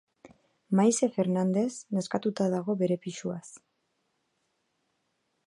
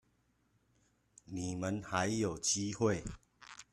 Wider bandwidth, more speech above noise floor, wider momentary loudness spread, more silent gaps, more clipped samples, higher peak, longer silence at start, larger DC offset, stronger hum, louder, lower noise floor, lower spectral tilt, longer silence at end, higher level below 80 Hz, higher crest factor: second, 11.5 kHz vs 13 kHz; first, 49 dB vs 40 dB; second, 11 LU vs 19 LU; neither; neither; first, -10 dBFS vs -18 dBFS; second, 0.25 s vs 1.3 s; neither; neither; first, -28 LUFS vs -36 LUFS; about the same, -77 dBFS vs -75 dBFS; first, -6 dB/octave vs -4 dB/octave; first, 1.9 s vs 0.1 s; second, -78 dBFS vs -62 dBFS; about the same, 20 dB vs 22 dB